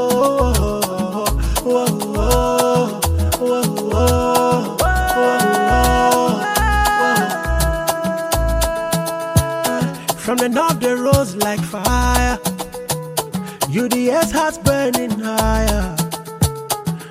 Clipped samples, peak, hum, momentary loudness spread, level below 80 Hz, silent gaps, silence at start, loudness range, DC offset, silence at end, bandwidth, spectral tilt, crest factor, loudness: under 0.1%; 0 dBFS; none; 7 LU; -26 dBFS; none; 0 s; 3 LU; under 0.1%; 0 s; 16 kHz; -4.5 dB/octave; 16 dB; -17 LUFS